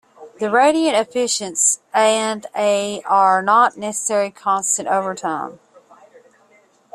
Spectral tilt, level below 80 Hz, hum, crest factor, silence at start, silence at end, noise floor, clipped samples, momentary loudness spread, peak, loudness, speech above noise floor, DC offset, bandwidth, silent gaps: -2 dB/octave; -68 dBFS; none; 16 dB; 0.2 s; 1.4 s; -55 dBFS; under 0.1%; 9 LU; -2 dBFS; -17 LUFS; 37 dB; under 0.1%; 13.5 kHz; none